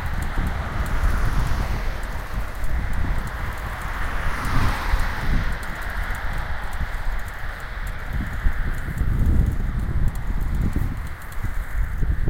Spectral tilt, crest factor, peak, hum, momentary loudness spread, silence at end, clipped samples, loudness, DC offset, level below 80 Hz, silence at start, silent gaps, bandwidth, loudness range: -6 dB/octave; 16 dB; -6 dBFS; none; 8 LU; 0 s; under 0.1%; -27 LUFS; under 0.1%; -24 dBFS; 0 s; none; 16.5 kHz; 3 LU